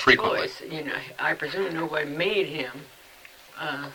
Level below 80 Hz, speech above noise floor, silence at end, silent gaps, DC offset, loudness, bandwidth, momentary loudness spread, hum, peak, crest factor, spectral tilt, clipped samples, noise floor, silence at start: -58 dBFS; 23 dB; 0 s; none; under 0.1%; -27 LUFS; 20 kHz; 22 LU; none; -4 dBFS; 24 dB; -4.5 dB/octave; under 0.1%; -50 dBFS; 0 s